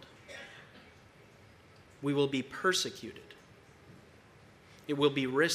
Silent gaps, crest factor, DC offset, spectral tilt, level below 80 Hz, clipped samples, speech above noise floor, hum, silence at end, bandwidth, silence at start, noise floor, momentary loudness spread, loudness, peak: none; 22 dB; under 0.1%; -4 dB/octave; -72 dBFS; under 0.1%; 27 dB; none; 0 s; 15.5 kHz; 0 s; -58 dBFS; 25 LU; -31 LUFS; -14 dBFS